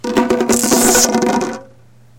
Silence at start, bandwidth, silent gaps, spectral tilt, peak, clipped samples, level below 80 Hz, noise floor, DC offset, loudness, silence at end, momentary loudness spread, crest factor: 0.05 s; 17 kHz; none; -2.5 dB/octave; 0 dBFS; under 0.1%; -42 dBFS; -46 dBFS; under 0.1%; -13 LUFS; 0.55 s; 12 LU; 16 dB